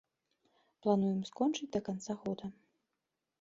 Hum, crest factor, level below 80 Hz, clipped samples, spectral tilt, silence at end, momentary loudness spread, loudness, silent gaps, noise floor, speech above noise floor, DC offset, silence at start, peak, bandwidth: none; 20 dB; -72 dBFS; under 0.1%; -6.5 dB/octave; 0.9 s; 10 LU; -36 LUFS; none; -87 dBFS; 53 dB; under 0.1%; 0.85 s; -18 dBFS; 7.8 kHz